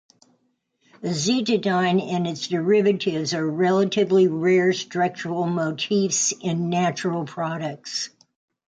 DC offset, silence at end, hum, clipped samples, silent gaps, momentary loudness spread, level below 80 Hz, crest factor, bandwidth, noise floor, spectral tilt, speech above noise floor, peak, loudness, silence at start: under 0.1%; 0.65 s; none; under 0.1%; none; 9 LU; -68 dBFS; 14 dB; 9.4 kHz; -70 dBFS; -4.5 dB/octave; 48 dB; -8 dBFS; -22 LUFS; 1 s